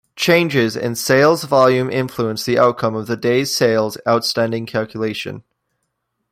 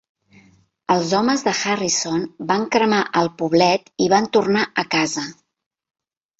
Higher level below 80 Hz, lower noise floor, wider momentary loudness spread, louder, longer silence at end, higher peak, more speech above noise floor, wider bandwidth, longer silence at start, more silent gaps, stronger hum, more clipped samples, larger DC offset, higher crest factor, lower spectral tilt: about the same, -58 dBFS vs -60 dBFS; first, -73 dBFS vs -55 dBFS; about the same, 9 LU vs 7 LU; about the same, -17 LUFS vs -19 LUFS; second, 0.9 s vs 1.1 s; about the same, 0 dBFS vs -2 dBFS; first, 56 dB vs 36 dB; first, 16.5 kHz vs 8.2 kHz; second, 0.15 s vs 0.9 s; neither; neither; neither; neither; about the same, 16 dB vs 18 dB; about the same, -4.5 dB/octave vs -3.5 dB/octave